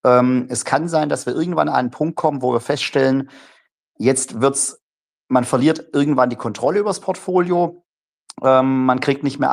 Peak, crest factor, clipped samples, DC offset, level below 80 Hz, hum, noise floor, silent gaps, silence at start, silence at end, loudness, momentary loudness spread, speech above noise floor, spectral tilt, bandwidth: -2 dBFS; 16 dB; under 0.1%; under 0.1%; -64 dBFS; none; -90 dBFS; 3.72-3.94 s, 4.83-5.27 s, 7.86-8.26 s; 0.05 s; 0 s; -18 LUFS; 6 LU; 72 dB; -5 dB/octave; 14 kHz